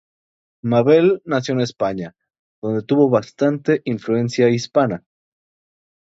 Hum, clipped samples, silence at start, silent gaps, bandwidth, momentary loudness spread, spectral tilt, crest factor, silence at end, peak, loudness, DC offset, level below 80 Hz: none; under 0.1%; 0.65 s; 2.39-2.62 s; 7.8 kHz; 13 LU; -7 dB/octave; 18 dB; 1.15 s; -2 dBFS; -18 LUFS; under 0.1%; -60 dBFS